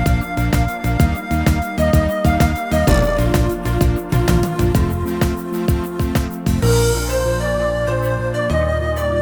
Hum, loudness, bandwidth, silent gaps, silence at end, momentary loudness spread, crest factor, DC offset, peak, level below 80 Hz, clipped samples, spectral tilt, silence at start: none; -18 LUFS; over 20 kHz; none; 0 s; 4 LU; 16 dB; 0.2%; 0 dBFS; -22 dBFS; under 0.1%; -6 dB/octave; 0 s